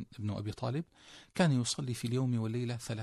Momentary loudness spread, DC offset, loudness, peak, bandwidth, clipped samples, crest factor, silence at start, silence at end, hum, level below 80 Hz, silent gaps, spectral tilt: 12 LU; under 0.1%; -34 LUFS; -16 dBFS; 13 kHz; under 0.1%; 20 dB; 0 s; 0 s; none; -66 dBFS; none; -5.5 dB/octave